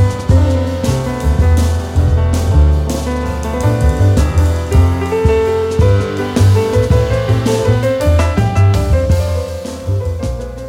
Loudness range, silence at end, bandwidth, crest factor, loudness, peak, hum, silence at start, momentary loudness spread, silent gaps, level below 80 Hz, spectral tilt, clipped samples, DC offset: 1 LU; 0 s; 15.5 kHz; 12 dB; -14 LUFS; 0 dBFS; none; 0 s; 7 LU; none; -18 dBFS; -7 dB/octave; under 0.1%; under 0.1%